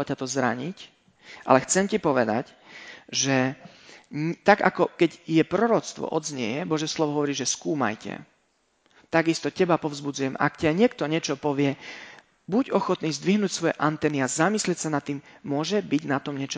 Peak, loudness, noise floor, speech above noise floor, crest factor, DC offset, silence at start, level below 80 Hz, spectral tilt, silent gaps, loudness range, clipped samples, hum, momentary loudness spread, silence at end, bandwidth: -2 dBFS; -25 LUFS; -69 dBFS; 44 dB; 24 dB; under 0.1%; 0 s; -64 dBFS; -4.5 dB/octave; none; 3 LU; under 0.1%; none; 14 LU; 0 s; 8 kHz